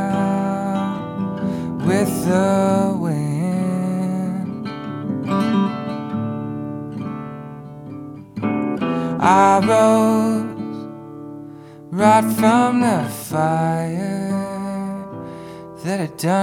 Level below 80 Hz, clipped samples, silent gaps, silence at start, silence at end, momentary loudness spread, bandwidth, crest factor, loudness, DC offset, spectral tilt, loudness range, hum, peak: -56 dBFS; under 0.1%; none; 0 s; 0 s; 20 LU; 18 kHz; 18 dB; -19 LUFS; under 0.1%; -6.5 dB/octave; 7 LU; none; 0 dBFS